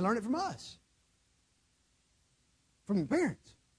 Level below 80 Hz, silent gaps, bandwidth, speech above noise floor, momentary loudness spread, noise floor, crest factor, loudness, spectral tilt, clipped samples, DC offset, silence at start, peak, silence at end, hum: -70 dBFS; none; 11 kHz; 40 dB; 19 LU; -73 dBFS; 18 dB; -34 LUFS; -6 dB/octave; under 0.1%; under 0.1%; 0 s; -18 dBFS; 0.45 s; none